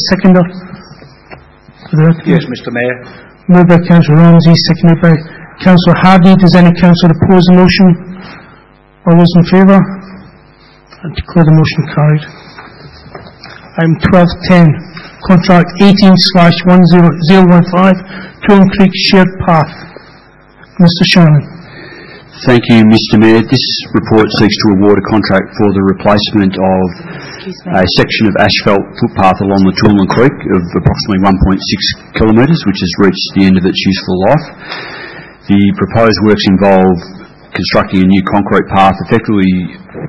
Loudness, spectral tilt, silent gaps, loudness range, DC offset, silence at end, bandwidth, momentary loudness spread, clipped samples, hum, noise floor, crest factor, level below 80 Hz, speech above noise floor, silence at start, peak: -8 LUFS; -7.5 dB/octave; none; 5 LU; 0.9%; 0 s; 6 kHz; 12 LU; 2%; none; -41 dBFS; 8 dB; -32 dBFS; 34 dB; 0 s; 0 dBFS